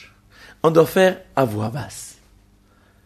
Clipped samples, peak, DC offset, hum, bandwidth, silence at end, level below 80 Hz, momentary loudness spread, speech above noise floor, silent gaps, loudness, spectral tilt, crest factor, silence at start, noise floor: under 0.1%; -2 dBFS; under 0.1%; 50 Hz at -50 dBFS; 13.5 kHz; 0.95 s; -54 dBFS; 19 LU; 37 dB; none; -19 LUFS; -6 dB/octave; 18 dB; 0.65 s; -55 dBFS